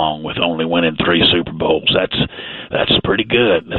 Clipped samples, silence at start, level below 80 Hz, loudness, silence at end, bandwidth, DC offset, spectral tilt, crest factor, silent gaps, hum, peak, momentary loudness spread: under 0.1%; 0 s; -40 dBFS; -15 LUFS; 0 s; 4.5 kHz; under 0.1%; -9.5 dB/octave; 16 dB; none; none; 0 dBFS; 7 LU